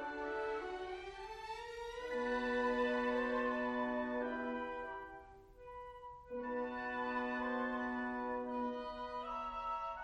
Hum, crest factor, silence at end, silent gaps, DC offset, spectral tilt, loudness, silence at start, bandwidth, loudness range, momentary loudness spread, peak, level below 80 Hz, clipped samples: none; 16 dB; 0 s; none; under 0.1%; -5 dB/octave; -40 LUFS; 0 s; 10 kHz; 5 LU; 14 LU; -26 dBFS; -64 dBFS; under 0.1%